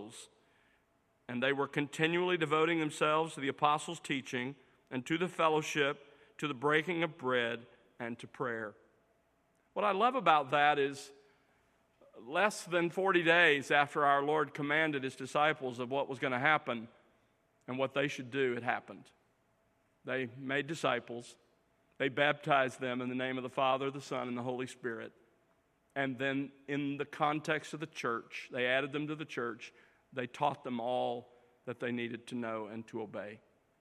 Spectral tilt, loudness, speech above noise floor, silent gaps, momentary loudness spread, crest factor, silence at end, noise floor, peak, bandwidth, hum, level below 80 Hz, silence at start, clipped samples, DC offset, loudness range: -4.5 dB/octave; -34 LUFS; 40 dB; none; 14 LU; 24 dB; 0.45 s; -74 dBFS; -10 dBFS; 14.5 kHz; none; -82 dBFS; 0 s; under 0.1%; under 0.1%; 8 LU